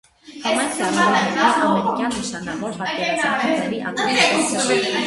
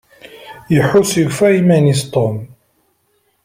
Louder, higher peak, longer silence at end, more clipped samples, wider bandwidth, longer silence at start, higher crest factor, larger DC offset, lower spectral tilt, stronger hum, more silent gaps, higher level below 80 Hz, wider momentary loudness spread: second, -19 LUFS vs -13 LUFS; about the same, -2 dBFS vs -2 dBFS; second, 0 s vs 1 s; neither; second, 11.5 kHz vs 16 kHz; second, 0.25 s vs 0.4 s; about the same, 18 dB vs 14 dB; neither; second, -3 dB/octave vs -6 dB/octave; neither; neither; second, -56 dBFS vs -50 dBFS; about the same, 10 LU vs 9 LU